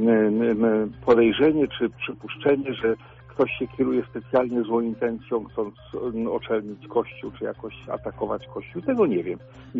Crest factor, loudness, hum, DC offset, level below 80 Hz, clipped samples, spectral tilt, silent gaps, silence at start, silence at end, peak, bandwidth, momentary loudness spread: 20 dB; -25 LUFS; none; under 0.1%; -54 dBFS; under 0.1%; -5 dB/octave; none; 0 s; 0 s; -4 dBFS; 5.8 kHz; 13 LU